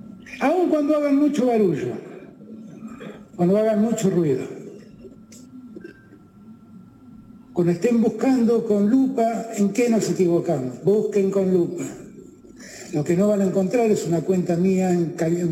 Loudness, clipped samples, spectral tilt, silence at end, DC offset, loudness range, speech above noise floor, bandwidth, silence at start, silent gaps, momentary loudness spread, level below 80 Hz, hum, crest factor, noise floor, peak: -21 LUFS; under 0.1%; -7 dB/octave; 0 s; under 0.1%; 7 LU; 28 dB; 16 kHz; 0.05 s; none; 20 LU; -62 dBFS; none; 14 dB; -48 dBFS; -8 dBFS